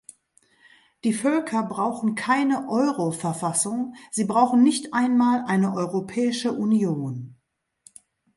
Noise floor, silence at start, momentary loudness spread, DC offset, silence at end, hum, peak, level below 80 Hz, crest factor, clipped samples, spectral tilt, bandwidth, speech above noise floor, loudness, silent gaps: -73 dBFS; 1.05 s; 9 LU; under 0.1%; 1.05 s; none; -6 dBFS; -70 dBFS; 18 dB; under 0.1%; -5 dB/octave; 11.5 kHz; 51 dB; -23 LUFS; none